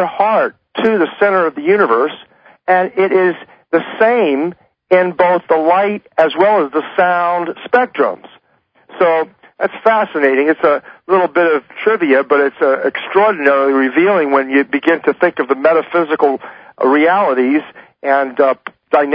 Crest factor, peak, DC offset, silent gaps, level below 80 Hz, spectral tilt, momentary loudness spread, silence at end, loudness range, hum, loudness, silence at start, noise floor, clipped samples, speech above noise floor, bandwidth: 14 dB; 0 dBFS; under 0.1%; none; -64 dBFS; -8 dB/octave; 6 LU; 0 s; 3 LU; none; -14 LUFS; 0 s; -56 dBFS; under 0.1%; 43 dB; 5.2 kHz